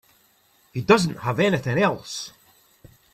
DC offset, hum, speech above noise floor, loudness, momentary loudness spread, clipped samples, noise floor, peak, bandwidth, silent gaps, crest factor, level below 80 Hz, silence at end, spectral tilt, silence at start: under 0.1%; none; 39 dB; -22 LUFS; 15 LU; under 0.1%; -61 dBFS; -2 dBFS; 14.5 kHz; none; 22 dB; -58 dBFS; 0.85 s; -5.5 dB/octave; 0.75 s